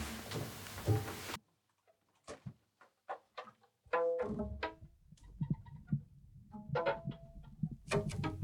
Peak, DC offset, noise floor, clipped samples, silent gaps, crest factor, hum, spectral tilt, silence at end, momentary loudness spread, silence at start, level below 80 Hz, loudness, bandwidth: -20 dBFS; under 0.1%; -76 dBFS; under 0.1%; none; 20 dB; none; -6 dB/octave; 0 s; 21 LU; 0 s; -58 dBFS; -40 LUFS; 19 kHz